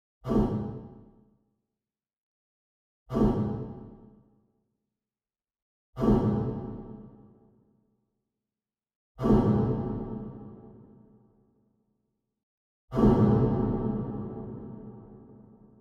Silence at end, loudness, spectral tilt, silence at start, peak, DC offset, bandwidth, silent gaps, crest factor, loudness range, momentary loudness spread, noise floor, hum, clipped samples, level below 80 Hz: 0.5 s; -28 LUFS; -10.5 dB/octave; 0.25 s; -10 dBFS; under 0.1%; 6.8 kHz; 2.17-3.06 s, 5.62-5.93 s, 8.96-9.15 s, 12.43-12.88 s; 20 dB; 6 LU; 23 LU; under -90 dBFS; none; under 0.1%; -44 dBFS